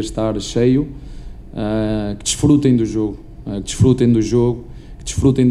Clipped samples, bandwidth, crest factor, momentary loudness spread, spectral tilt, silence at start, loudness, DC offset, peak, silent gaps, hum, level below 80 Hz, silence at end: under 0.1%; 13 kHz; 16 dB; 18 LU; -6.5 dB/octave; 0 s; -17 LUFS; under 0.1%; 0 dBFS; none; none; -32 dBFS; 0 s